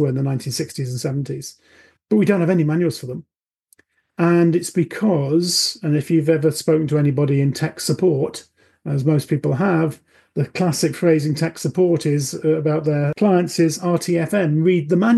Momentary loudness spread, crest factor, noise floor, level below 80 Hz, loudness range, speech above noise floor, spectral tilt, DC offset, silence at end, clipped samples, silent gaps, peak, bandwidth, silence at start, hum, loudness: 9 LU; 16 dB; -59 dBFS; -62 dBFS; 3 LU; 41 dB; -6 dB/octave; under 0.1%; 0 s; under 0.1%; none; -2 dBFS; 12.5 kHz; 0 s; none; -19 LUFS